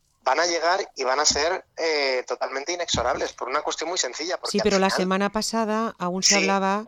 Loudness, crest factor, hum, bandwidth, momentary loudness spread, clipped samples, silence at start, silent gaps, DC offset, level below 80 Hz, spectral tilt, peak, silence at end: -23 LUFS; 16 dB; none; 19 kHz; 8 LU; under 0.1%; 0.25 s; none; under 0.1%; -52 dBFS; -2.5 dB/octave; -8 dBFS; 0 s